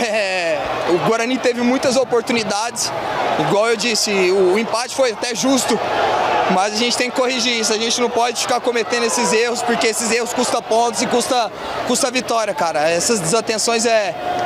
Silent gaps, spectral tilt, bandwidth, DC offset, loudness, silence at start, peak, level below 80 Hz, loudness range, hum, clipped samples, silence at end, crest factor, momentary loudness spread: none; -2.5 dB/octave; 16 kHz; under 0.1%; -17 LUFS; 0 s; -6 dBFS; -56 dBFS; 1 LU; none; under 0.1%; 0 s; 12 dB; 4 LU